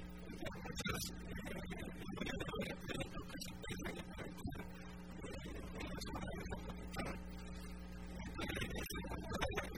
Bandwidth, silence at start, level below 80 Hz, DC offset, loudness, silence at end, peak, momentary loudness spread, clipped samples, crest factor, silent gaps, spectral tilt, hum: 19.5 kHz; 0 s; -52 dBFS; 0.1%; -46 LUFS; 0 s; -26 dBFS; 8 LU; under 0.1%; 20 dB; none; -4.5 dB/octave; none